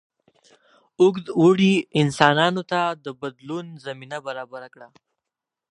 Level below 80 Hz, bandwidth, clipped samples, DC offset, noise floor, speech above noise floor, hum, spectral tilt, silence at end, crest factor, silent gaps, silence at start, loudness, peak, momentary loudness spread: -66 dBFS; 11 kHz; under 0.1%; under 0.1%; -86 dBFS; 65 dB; none; -6 dB/octave; 0.85 s; 22 dB; none; 1 s; -20 LUFS; 0 dBFS; 17 LU